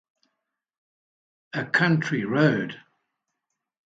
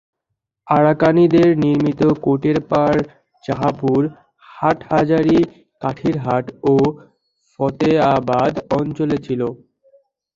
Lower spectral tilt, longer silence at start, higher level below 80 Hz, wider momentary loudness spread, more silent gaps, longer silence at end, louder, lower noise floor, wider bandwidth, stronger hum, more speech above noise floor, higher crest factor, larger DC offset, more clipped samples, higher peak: second, -7 dB/octave vs -8.5 dB/octave; first, 1.55 s vs 0.65 s; second, -72 dBFS vs -50 dBFS; first, 13 LU vs 10 LU; neither; first, 1.1 s vs 0.8 s; second, -23 LUFS vs -17 LUFS; first, -82 dBFS vs -78 dBFS; about the same, 7.8 kHz vs 7.4 kHz; neither; about the same, 59 dB vs 62 dB; about the same, 20 dB vs 16 dB; neither; neither; second, -6 dBFS vs -2 dBFS